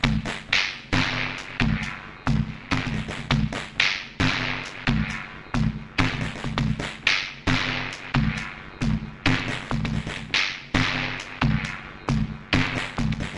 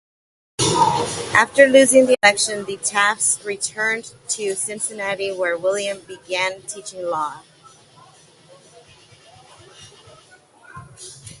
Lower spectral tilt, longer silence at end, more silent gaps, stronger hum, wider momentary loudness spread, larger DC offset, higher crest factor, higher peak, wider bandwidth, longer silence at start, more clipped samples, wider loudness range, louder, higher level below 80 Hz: first, -5 dB/octave vs -2.5 dB/octave; about the same, 0 s vs 0.05 s; neither; neither; second, 7 LU vs 18 LU; neither; about the same, 24 dB vs 22 dB; about the same, -2 dBFS vs 0 dBFS; about the same, 11.5 kHz vs 11.5 kHz; second, 0 s vs 0.6 s; neither; second, 1 LU vs 16 LU; second, -25 LUFS vs -18 LUFS; first, -36 dBFS vs -56 dBFS